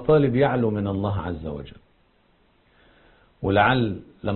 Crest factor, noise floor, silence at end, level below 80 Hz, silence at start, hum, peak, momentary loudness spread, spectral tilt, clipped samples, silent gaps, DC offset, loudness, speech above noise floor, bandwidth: 18 dB; -62 dBFS; 0 s; -44 dBFS; 0 s; none; -6 dBFS; 15 LU; -11.5 dB/octave; under 0.1%; none; under 0.1%; -23 LUFS; 40 dB; 4.3 kHz